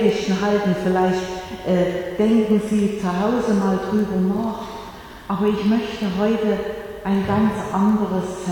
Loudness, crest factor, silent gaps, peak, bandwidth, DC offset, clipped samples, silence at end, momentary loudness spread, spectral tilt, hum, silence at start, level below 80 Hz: -21 LUFS; 16 dB; none; -4 dBFS; 18 kHz; under 0.1%; under 0.1%; 0 s; 10 LU; -7 dB/octave; none; 0 s; -46 dBFS